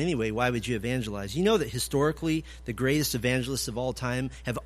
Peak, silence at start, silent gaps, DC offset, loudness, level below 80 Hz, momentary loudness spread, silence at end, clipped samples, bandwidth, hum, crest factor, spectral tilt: -10 dBFS; 0 s; none; under 0.1%; -28 LUFS; -46 dBFS; 6 LU; 0 s; under 0.1%; 15.5 kHz; none; 18 dB; -5 dB/octave